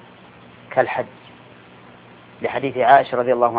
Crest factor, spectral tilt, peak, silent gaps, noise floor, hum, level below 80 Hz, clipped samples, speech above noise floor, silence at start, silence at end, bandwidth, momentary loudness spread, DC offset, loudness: 20 dB; -9 dB/octave; 0 dBFS; none; -45 dBFS; 60 Hz at -50 dBFS; -64 dBFS; under 0.1%; 27 dB; 0.7 s; 0 s; 4.9 kHz; 14 LU; under 0.1%; -19 LUFS